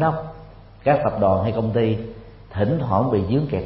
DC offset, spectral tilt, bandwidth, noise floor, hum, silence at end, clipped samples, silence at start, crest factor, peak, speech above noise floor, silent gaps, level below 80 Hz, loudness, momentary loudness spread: under 0.1%; -12.5 dB/octave; 5.8 kHz; -42 dBFS; none; 0 s; under 0.1%; 0 s; 16 dB; -4 dBFS; 22 dB; none; -44 dBFS; -21 LUFS; 11 LU